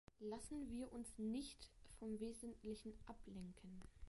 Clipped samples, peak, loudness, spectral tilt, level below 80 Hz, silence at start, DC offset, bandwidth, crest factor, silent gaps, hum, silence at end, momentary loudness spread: under 0.1%; -38 dBFS; -53 LUFS; -5.5 dB/octave; -66 dBFS; 0.2 s; under 0.1%; 11.5 kHz; 14 dB; none; none; 0 s; 12 LU